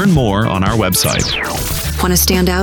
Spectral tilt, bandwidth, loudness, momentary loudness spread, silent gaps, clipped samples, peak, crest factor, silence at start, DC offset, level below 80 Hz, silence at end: -4 dB/octave; 19.5 kHz; -14 LUFS; 6 LU; none; under 0.1%; -2 dBFS; 12 dB; 0 s; under 0.1%; -24 dBFS; 0 s